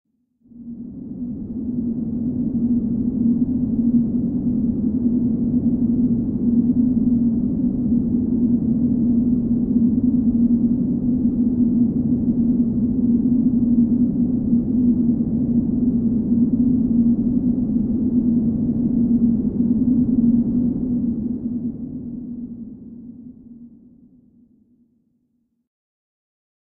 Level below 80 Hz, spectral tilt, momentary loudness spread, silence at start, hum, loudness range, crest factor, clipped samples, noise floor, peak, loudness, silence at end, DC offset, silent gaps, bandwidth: -38 dBFS; -15 dB/octave; 11 LU; 0.55 s; none; 6 LU; 12 dB; under 0.1%; -68 dBFS; -6 dBFS; -19 LUFS; 3.1 s; under 0.1%; none; 1.2 kHz